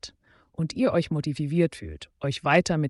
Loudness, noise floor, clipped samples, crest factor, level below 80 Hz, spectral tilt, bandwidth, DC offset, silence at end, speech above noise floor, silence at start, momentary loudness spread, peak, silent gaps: -26 LUFS; -57 dBFS; under 0.1%; 18 dB; -52 dBFS; -6 dB/octave; 11.5 kHz; under 0.1%; 0 s; 32 dB; 0.05 s; 18 LU; -8 dBFS; none